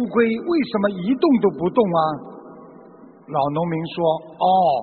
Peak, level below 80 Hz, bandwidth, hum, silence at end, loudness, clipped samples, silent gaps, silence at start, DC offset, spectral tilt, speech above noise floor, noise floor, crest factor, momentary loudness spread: -2 dBFS; -60 dBFS; 4.5 kHz; none; 0 s; -20 LUFS; under 0.1%; none; 0 s; under 0.1%; -5.5 dB/octave; 26 dB; -45 dBFS; 18 dB; 8 LU